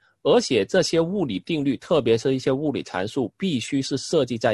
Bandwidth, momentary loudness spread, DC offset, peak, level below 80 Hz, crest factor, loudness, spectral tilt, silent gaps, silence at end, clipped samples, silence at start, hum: 12 kHz; 6 LU; under 0.1%; -6 dBFS; -56 dBFS; 16 dB; -23 LUFS; -5 dB/octave; none; 0 s; under 0.1%; 0.25 s; none